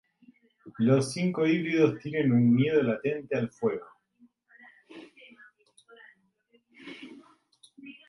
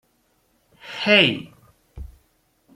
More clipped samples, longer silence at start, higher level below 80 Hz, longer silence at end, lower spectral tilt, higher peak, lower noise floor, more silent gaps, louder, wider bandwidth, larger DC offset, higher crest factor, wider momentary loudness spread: neither; second, 0.65 s vs 0.85 s; second, -70 dBFS vs -48 dBFS; second, 0.15 s vs 0.7 s; first, -7 dB/octave vs -5 dB/octave; second, -8 dBFS vs -2 dBFS; about the same, -68 dBFS vs -65 dBFS; neither; second, -26 LUFS vs -18 LUFS; second, 11.5 kHz vs 14.5 kHz; neither; about the same, 20 dB vs 22 dB; about the same, 26 LU vs 27 LU